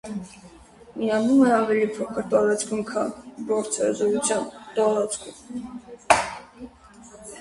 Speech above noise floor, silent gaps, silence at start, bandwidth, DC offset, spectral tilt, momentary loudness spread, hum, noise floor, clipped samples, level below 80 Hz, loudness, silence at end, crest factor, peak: 25 dB; none; 0.05 s; 11.5 kHz; under 0.1%; -4 dB/octave; 22 LU; none; -48 dBFS; under 0.1%; -58 dBFS; -23 LUFS; 0 s; 24 dB; -2 dBFS